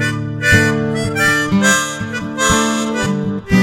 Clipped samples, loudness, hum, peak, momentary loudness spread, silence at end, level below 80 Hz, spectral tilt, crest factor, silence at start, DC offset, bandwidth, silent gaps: under 0.1%; -15 LUFS; none; 0 dBFS; 8 LU; 0 s; -36 dBFS; -4 dB/octave; 16 dB; 0 s; under 0.1%; 16.5 kHz; none